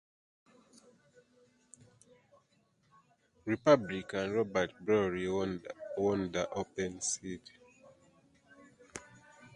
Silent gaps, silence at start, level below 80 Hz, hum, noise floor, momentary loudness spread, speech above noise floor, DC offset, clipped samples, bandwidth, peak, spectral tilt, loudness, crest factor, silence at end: none; 3.45 s; -66 dBFS; none; -72 dBFS; 19 LU; 39 dB; under 0.1%; under 0.1%; 11 kHz; -12 dBFS; -4.5 dB/octave; -33 LUFS; 26 dB; 0.05 s